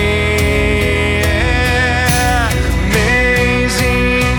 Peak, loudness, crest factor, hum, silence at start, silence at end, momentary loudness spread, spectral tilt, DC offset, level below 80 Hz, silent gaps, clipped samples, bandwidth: 0 dBFS; -13 LUFS; 12 dB; none; 0 s; 0 s; 2 LU; -4.5 dB/octave; under 0.1%; -20 dBFS; none; under 0.1%; over 20 kHz